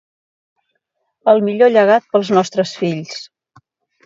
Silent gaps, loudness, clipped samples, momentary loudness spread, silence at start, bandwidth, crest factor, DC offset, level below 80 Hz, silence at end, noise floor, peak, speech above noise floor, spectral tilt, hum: none; -15 LUFS; under 0.1%; 13 LU; 1.25 s; 7.8 kHz; 16 dB; under 0.1%; -68 dBFS; 0.8 s; -71 dBFS; 0 dBFS; 57 dB; -5.5 dB/octave; none